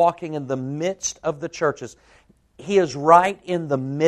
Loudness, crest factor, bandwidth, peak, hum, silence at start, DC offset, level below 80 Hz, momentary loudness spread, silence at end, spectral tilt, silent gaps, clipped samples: -21 LUFS; 22 dB; 12 kHz; 0 dBFS; none; 0 s; under 0.1%; -60 dBFS; 15 LU; 0 s; -5 dB/octave; none; under 0.1%